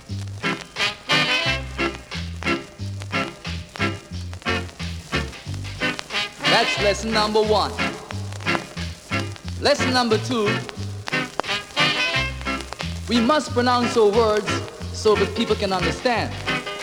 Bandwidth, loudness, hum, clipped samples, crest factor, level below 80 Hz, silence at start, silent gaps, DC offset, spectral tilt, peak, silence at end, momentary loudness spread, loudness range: 17 kHz; -22 LUFS; none; under 0.1%; 22 dB; -40 dBFS; 0 s; none; under 0.1%; -4 dB/octave; -2 dBFS; 0 s; 13 LU; 7 LU